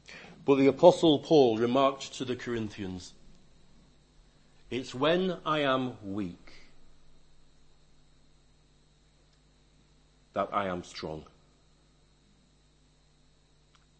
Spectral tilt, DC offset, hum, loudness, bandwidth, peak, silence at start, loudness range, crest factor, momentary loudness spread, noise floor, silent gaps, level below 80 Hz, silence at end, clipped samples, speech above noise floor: -6 dB/octave; under 0.1%; none; -28 LUFS; 8.6 kHz; -6 dBFS; 0.1 s; 17 LU; 26 dB; 19 LU; -64 dBFS; none; -60 dBFS; 2.75 s; under 0.1%; 37 dB